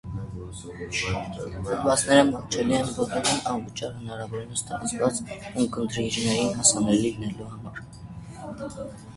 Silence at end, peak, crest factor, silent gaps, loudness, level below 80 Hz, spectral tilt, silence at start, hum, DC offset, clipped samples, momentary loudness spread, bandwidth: 0 s; -4 dBFS; 24 dB; none; -25 LUFS; -48 dBFS; -3.5 dB/octave; 0.05 s; none; under 0.1%; under 0.1%; 19 LU; 11.5 kHz